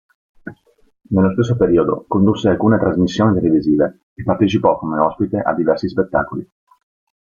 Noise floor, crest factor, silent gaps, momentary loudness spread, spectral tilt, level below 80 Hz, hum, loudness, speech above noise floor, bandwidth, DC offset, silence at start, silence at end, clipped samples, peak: -45 dBFS; 16 dB; 4.03-4.16 s; 12 LU; -8 dB/octave; -46 dBFS; none; -16 LUFS; 30 dB; 7.2 kHz; under 0.1%; 0.45 s; 0.8 s; under 0.1%; -2 dBFS